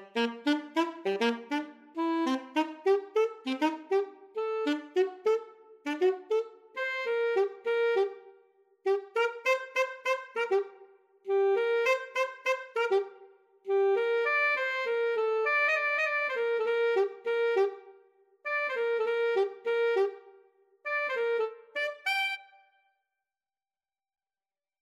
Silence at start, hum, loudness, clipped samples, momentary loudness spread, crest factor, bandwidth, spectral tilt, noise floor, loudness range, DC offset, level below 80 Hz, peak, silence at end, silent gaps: 0 s; none; -30 LUFS; under 0.1%; 8 LU; 14 dB; 13.5 kHz; -3 dB/octave; under -90 dBFS; 4 LU; under 0.1%; under -90 dBFS; -16 dBFS; 2.4 s; none